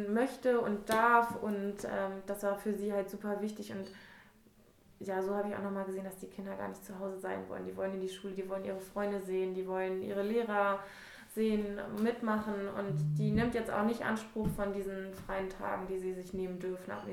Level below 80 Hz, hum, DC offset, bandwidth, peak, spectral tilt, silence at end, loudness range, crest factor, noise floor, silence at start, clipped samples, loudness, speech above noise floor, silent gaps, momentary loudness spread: -58 dBFS; none; under 0.1%; 17.5 kHz; -14 dBFS; -6.5 dB/octave; 0 s; 7 LU; 22 dB; -64 dBFS; 0 s; under 0.1%; -36 LUFS; 28 dB; none; 11 LU